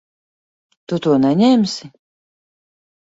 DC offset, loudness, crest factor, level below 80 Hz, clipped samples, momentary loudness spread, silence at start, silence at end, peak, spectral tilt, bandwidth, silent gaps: under 0.1%; -16 LUFS; 16 dB; -62 dBFS; under 0.1%; 12 LU; 0.9 s; 1.25 s; -4 dBFS; -6.5 dB/octave; 7.8 kHz; none